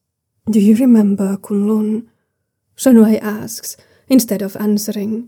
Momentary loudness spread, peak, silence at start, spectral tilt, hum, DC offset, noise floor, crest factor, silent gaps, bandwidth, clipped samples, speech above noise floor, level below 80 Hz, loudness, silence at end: 14 LU; 0 dBFS; 0.45 s; -6 dB/octave; none; under 0.1%; -71 dBFS; 14 dB; none; 20 kHz; under 0.1%; 57 dB; -62 dBFS; -14 LUFS; 0 s